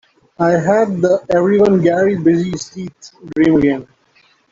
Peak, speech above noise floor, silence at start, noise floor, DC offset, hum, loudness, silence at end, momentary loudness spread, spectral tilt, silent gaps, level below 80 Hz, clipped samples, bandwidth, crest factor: -2 dBFS; 40 dB; 0.4 s; -54 dBFS; under 0.1%; none; -14 LUFS; 0.7 s; 13 LU; -7 dB/octave; none; -48 dBFS; under 0.1%; 7.6 kHz; 14 dB